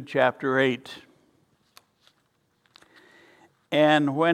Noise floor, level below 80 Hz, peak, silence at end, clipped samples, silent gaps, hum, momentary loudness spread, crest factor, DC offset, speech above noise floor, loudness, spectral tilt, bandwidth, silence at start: -70 dBFS; -76 dBFS; -6 dBFS; 0 s; under 0.1%; none; none; 19 LU; 22 dB; under 0.1%; 47 dB; -23 LUFS; -6 dB/octave; 13.5 kHz; 0 s